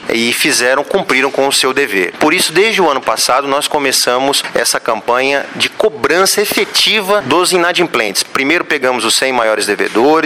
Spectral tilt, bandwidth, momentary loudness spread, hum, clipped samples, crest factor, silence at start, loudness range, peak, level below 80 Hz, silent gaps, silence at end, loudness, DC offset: -1.5 dB/octave; 16.5 kHz; 4 LU; none; under 0.1%; 12 dB; 0 s; 1 LU; -2 dBFS; -52 dBFS; none; 0 s; -12 LUFS; under 0.1%